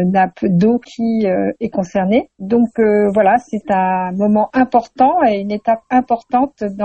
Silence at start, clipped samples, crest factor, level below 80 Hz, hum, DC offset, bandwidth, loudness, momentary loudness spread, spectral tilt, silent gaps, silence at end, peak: 0 s; under 0.1%; 14 dB; -50 dBFS; none; under 0.1%; 8.2 kHz; -15 LUFS; 6 LU; -8 dB/octave; none; 0 s; -2 dBFS